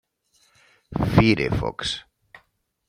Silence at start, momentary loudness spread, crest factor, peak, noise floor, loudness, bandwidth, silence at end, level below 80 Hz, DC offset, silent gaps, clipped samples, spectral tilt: 0.9 s; 14 LU; 24 dB; -2 dBFS; -66 dBFS; -22 LUFS; 14.5 kHz; 0.9 s; -40 dBFS; under 0.1%; none; under 0.1%; -6 dB/octave